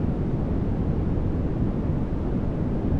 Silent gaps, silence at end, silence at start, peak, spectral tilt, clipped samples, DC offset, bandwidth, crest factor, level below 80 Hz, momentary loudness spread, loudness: none; 0 s; 0 s; -12 dBFS; -11 dB/octave; under 0.1%; under 0.1%; 6.2 kHz; 12 dB; -30 dBFS; 1 LU; -27 LUFS